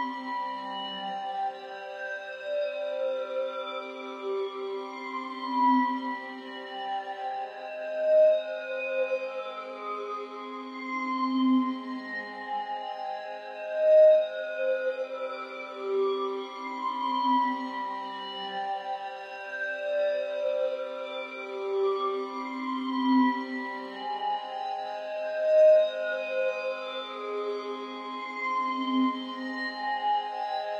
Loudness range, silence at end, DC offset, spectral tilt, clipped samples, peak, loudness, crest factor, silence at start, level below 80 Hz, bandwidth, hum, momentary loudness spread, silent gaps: 6 LU; 0 s; under 0.1%; -4.5 dB/octave; under 0.1%; -12 dBFS; -30 LUFS; 18 dB; 0 s; under -90 dBFS; 7.2 kHz; none; 12 LU; none